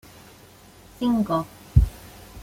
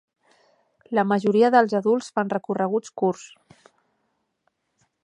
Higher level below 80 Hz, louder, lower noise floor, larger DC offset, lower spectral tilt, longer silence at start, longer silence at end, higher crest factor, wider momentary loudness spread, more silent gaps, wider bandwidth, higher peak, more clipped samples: first, -30 dBFS vs -76 dBFS; about the same, -24 LUFS vs -22 LUFS; second, -49 dBFS vs -74 dBFS; neither; first, -8 dB/octave vs -6.5 dB/octave; about the same, 1 s vs 0.9 s; second, 0 s vs 1.75 s; about the same, 22 dB vs 22 dB; first, 17 LU vs 9 LU; neither; first, 16.5 kHz vs 11 kHz; about the same, -2 dBFS vs -4 dBFS; neither